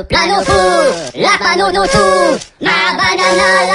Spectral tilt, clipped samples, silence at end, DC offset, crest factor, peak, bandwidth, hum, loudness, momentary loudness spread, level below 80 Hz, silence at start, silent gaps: -3 dB/octave; under 0.1%; 0 s; under 0.1%; 12 dB; 0 dBFS; 11 kHz; none; -11 LUFS; 5 LU; -34 dBFS; 0 s; none